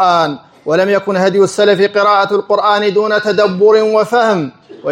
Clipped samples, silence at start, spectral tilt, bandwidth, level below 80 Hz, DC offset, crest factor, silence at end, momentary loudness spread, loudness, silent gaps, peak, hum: under 0.1%; 0 s; -5 dB/octave; 11 kHz; -64 dBFS; under 0.1%; 12 dB; 0 s; 7 LU; -12 LUFS; none; 0 dBFS; none